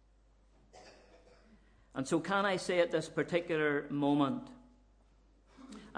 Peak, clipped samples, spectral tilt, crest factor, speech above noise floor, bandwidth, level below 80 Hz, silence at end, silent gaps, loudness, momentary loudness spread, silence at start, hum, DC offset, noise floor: -16 dBFS; under 0.1%; -5.5 dB/octave; 20 dB; 33 dB; 10.5 kHz; -66 dBFS; 0 s; none; -33 LUFS; 15 LU; 0.75 s; none; under 0.1%; -66 dBFS